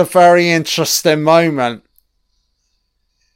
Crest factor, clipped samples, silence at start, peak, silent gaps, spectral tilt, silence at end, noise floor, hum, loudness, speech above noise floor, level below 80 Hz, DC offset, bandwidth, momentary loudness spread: 14 dB; under 0.1%; 0 s; 0 dBFS; none; -4 dB/octave; 1.6 s; -66 dBFS; none; -12 LUFS; 54 dB; -60 dBFS; under 0.1%; 16.5 kHz; 11 LU